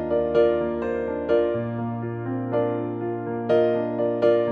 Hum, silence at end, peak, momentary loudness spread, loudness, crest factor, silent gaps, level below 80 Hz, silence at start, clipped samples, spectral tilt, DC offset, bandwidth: none; 0 s; -8 dBFS; 8 LU; -24 LUFS; 16 dB; none; -54 dBFS; 0 s; under 0.1%; -9.5 dB/octave; under 0.1%; 6.2 kHz